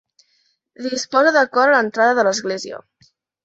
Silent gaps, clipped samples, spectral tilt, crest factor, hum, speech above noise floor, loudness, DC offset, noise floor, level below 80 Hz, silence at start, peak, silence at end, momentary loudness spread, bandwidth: none; under 0.1%; -2.5 dB/octave; 18 dB; none; 47 dB; -17 LUFS; under 0.1%; -65 dBFS; -70 dBFS; 0.8 s; -2 dBFS; 0.65 s; 15 LU; 8 kHz